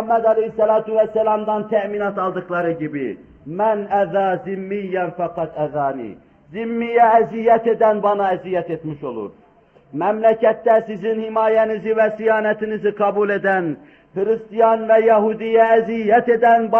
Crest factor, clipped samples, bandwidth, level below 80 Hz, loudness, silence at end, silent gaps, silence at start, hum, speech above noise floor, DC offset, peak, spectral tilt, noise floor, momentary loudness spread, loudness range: 14 dB; under 0.1%; 3.4 kHz; -60 dBFS; -18 LUFS; 0 s; none; 0 s; none; 34 dB; under 0.1%; -4 dBFS; -8.5 dB/octave; -52 dBFS; 13 LU; 5 LU